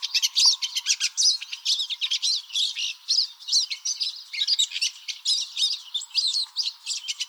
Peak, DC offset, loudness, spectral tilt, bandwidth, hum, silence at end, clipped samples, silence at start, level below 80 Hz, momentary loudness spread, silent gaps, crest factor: -6 dBFS; under 0.1%; -23 LUFS; 14.5 dB/octave; over 20 kHz; none; 0 s; under 0.1%; 0 s; under -90 dBFS; 9 LU; none; 20 dB